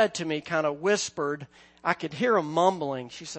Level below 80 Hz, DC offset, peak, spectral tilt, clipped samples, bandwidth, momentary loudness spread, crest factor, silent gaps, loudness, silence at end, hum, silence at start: -70 dBFS; under 0.1%; -6 dBFS; -4 dB/octave; under 0.1%; 8.8 kHz; 8 LU; 22 dB; none; -27 LUFS; 0 s; none; 0 s